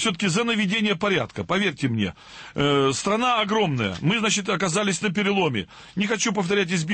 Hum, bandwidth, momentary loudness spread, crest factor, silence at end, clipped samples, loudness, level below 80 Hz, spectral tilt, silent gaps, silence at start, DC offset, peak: none; 8.8 kHz; 6 LU; 12 dB; 0 s; under 0.1%; -23 LUFS; -56 dBFS; -4 dB/octave; none; 0 s; under 0.1%; -10 dBFS